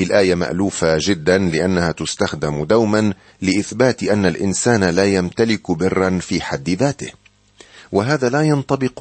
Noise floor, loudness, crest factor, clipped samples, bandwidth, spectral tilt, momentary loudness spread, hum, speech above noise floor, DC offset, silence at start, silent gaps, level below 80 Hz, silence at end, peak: -48 dBFS; -18 LUFS; 16 dB; under 0.1%; 8.8 kHz; -5 dB/octave; 6 LU; none; 31 dB; under 0.1%; 0 s; none; -46 dBFS; 0 s; -2 dBFS